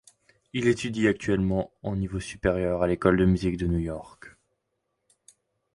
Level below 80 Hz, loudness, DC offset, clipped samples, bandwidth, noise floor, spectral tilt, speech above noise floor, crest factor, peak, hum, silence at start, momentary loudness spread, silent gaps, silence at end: -42 dBFS; -26 LUFS; under 0.1%; under 0.1%; 11.5 kHz; -79 dBFS; -7 dB/octave; 53 dB; 20 dB; -6 dBFS; none; 0.55 s; 10 LU; none; 1.45 s